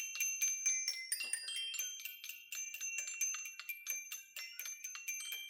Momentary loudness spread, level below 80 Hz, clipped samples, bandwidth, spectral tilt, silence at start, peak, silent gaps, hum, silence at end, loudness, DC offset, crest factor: 11 LU; under -90 dBFS; under 0.1%; over 20 kHz; 6.5 dB/octave; 0 s; -22 dBFS; none; none; 0 s; -39 LUFS; under 0.1%; 20 dB